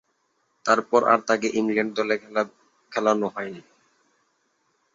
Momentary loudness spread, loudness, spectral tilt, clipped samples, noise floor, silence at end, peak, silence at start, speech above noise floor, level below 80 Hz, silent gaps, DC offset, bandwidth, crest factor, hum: 12 LU; -23 LUFS; -4.5 dB/octave; under 0.1%; -71 dBFS; 1.35 s; -4 dBFS; 0.65 s; 48 dB; -70 dBFS; none; under 0.1%; 7.8 kHz; 22 dB; none